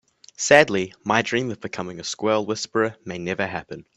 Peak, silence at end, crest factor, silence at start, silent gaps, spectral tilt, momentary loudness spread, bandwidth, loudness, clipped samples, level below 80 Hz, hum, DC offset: 0 dBFS; 0.15 s; 24 dB; 0.4 s; none; -3.5 dB/octave; 15 LU; 11.5 kHz; -22 LUFS; under 0.1%; -62 dBFS; none; under 0.1%